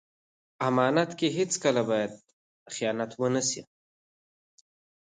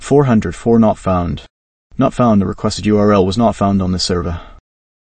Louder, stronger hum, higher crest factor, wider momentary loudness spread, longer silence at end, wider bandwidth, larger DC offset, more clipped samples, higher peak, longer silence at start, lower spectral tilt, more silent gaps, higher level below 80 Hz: second, -28 LUFS vs -14 LUFS; neither; first, 20 dB vs 14 dB; second, 8 LU vs 11 LU; first, 1.4 s vs 0.5 s; about the same, 9.6 kHz vs 8.8 kHz; neither; neither; second, -10 dBFS vs 0 dBFS; first, 0.6 s vs 0 s; second, -4 dB/octave vs -6.5 dB/octave; second, 2.33-2.66 s vs 1.50-1.90 s; second, -76 dBFS vs -36 dBFS